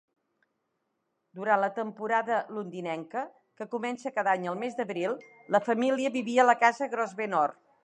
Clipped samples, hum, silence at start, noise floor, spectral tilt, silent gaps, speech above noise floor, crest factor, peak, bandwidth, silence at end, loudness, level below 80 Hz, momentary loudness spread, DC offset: under 0.1%; none; 1.35 s; -79 dBFS; -5 dB/octave; none; 51 dB; 22 dB; -8 dBFS; 10 kHz; 0.3 s; -29 LUFS; -86 dBFS; 13 LU; under 0.1%